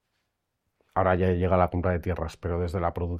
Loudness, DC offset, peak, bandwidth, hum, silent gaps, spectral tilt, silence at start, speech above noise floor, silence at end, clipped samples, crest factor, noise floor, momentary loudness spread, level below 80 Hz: -27 LUFS; under 0.1%; -6 dBFS; 9.2 kHz; none; none; -8.5 dB/octave; 0.95 s; 53 dB; 0 s; under 0.1%; 20 dB; -79 dBFS; 8 LU; -46 dBFS